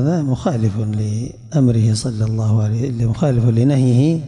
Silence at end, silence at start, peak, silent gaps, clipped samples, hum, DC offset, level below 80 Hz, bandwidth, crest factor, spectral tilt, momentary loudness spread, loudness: 0 s; 0 s; -6 dBFS; none; under 0.1%; none; under 0.1%; -42 dBFS; 11 kHz; 10 dB; -8 dB/octave; 7 LU; -17 LUFS